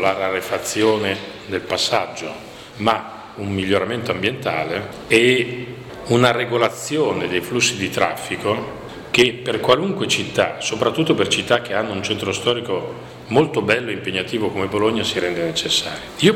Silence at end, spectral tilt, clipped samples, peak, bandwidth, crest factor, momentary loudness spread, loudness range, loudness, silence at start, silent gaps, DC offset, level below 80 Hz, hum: 0 s; -4 dB/octave; under 0.1%; -2 dBFS; 17.5 kHz; 18 dB; 11 LU; 3 LU; -19 LUFS; 0 s; none; under 0.1%; -52 dBFS; none